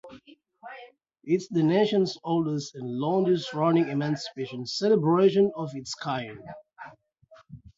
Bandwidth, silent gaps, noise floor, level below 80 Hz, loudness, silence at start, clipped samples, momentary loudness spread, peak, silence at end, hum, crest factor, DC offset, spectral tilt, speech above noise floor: 7.8 kHz; none; -57 dBFS; -68 dBFS; -26 LUFS; 0.05 s; under 0.1%; 23 LU; -10 dBFS; 0.2 s; none; 18 dB; under 0.1%; -6.5 dB/octave; 32 dB